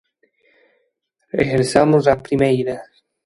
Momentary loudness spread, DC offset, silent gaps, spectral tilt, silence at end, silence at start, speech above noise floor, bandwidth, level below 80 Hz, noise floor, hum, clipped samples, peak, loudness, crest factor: 12 LU; under 0.1%; none; -6.5 dB/octave; 0.4 s; 1.35 s; 53 dB; 11.5 kHz; -48 dBFS; -69 dBFS; none; under 0.1%; 0 dBFS; -17 LUFS; 20 dB